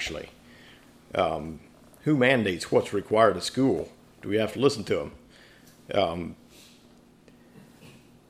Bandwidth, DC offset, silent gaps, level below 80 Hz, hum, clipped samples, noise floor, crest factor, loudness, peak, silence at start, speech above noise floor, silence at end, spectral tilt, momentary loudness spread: 15.5 kHz; under 0.1%; none; -58 dBFS; none; under 0.1%; -56 dBFS; 22 dB; -26 LUFS; -6 dBFS; 0 s; 30 dB; 0.4 s; -5.5 dB/octave; 19 LU